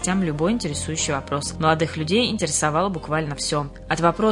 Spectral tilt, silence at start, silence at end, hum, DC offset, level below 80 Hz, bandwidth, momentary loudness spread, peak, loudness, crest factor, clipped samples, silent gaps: -4 dB/octave; 0 s; 0 s; none; under 0.1%; -44 dBFS; 11 kHz; 5 LU; -2 dBFS; -22 LUFS; 20 dB; under 0.1%; none